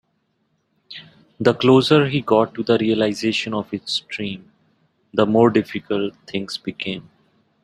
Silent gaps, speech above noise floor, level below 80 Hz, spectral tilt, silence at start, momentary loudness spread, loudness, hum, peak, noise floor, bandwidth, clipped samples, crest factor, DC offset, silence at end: none; 49 dB; -60 dBFS; -6 dB/octave; 0.9 s; 15 LU; -19 LUFS; none; -2 dBFS; -68 dBFS; 13 kHz; under 0.1%; 20 dB; under 0.1%; 0.65 s